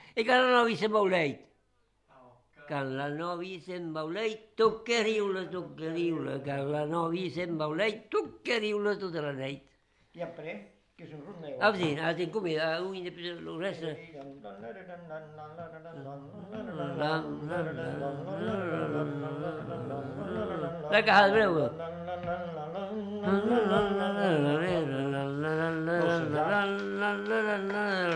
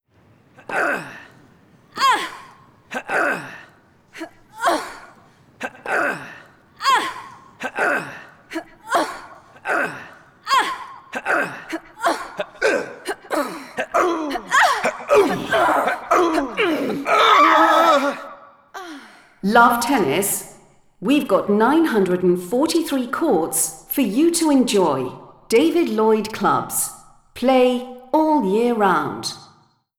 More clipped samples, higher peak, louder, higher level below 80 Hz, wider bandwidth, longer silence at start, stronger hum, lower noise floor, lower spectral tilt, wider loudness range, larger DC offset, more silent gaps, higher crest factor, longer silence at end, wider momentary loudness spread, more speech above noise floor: neither; second, -8 dBFS vs -2 dBFS; second, -30 LUFS vs -19 LUFS; second, -66 dBFS vs -58 dBFS; second, 11 kHz vs 20 kHz; second, 0 s vs 0.7 s; neither; first, -72 dBFS vs -56 dBFS; first, -6 dB/octave vs -3.5 dB/octave; about the same, 9 LU vs 8 LU; neither; neither; about the same, 22 dB vs 18 dB; second, 0 s vs 0.55 s; about the same, 18 LU vs 17 LU; about the same, 41 dB vs 38 dB